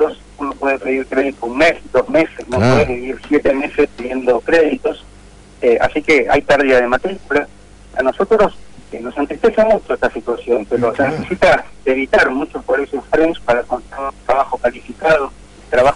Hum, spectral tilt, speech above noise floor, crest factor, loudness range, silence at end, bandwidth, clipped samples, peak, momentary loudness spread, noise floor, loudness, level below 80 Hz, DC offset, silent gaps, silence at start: none; -6 dB/octave; 26 dB; 12 dB; 2 LU; 0 s; 11 kHz; under 0.1%; -4 dBFS; 10 LU; -41 dBFS; -16 LUFS; -40 dBFS; under 0.1%; none; 0 s